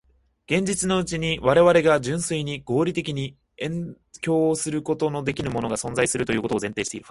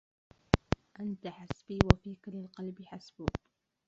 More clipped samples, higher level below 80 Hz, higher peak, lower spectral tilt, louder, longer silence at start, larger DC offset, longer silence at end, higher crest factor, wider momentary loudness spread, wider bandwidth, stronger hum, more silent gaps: neither; second, -50 dBFS vs -44 dBFS; about the same, -4 dBFS vs -2 dBFS; second, -4.5 dB/octave vs -6 dB/octave; first, -23 LUFS vs -34 LUFS; about the same, 0.5 s vs 0.55 s; neither; second, 0.1 s vs 0.5 s; second, 20 dB vs 32 dB; second, 12 LU vs 17 LU; first, 11.5 kHz vs 7.8 kHz; neither; neither